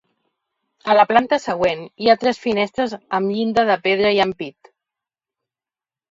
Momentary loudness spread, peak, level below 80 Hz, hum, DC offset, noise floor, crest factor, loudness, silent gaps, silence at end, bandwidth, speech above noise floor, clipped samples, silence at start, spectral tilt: 8 LU; 0 dBFS; -58 dBFS; none; under 0.1%; under -90 dBFS; 20 dB; -18 LUFS; none; 1.6 s; 7.8 kHz; over 72 dB; under 0.1%; 0.85 s; -5 dB/octave